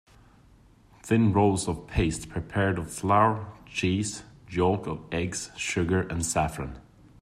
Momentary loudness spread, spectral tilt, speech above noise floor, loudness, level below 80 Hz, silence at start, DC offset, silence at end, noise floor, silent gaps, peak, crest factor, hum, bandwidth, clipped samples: 12 LU; -5.5 dB/octave; 30 dB; -27 LUFS; -46 dBFS; 1.05 s; under 0.1%; 0.4 s; -56 dBFS; none; -8 dBFS; 20 dB; none; 14 kHz; under 0.1%